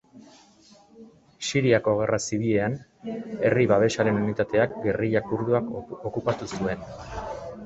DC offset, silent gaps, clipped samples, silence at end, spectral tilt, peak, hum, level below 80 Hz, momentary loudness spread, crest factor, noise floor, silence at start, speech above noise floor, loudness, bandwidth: under 0.1%; none; under 0.1%; 0 s; -5.5 dB/octave; -6 dBFS; none; -52 dBFS; 14 LU; 20 dB; -55 dBFS; 0.15 s; 30 dB; -25 LUFS; 8.2 kHz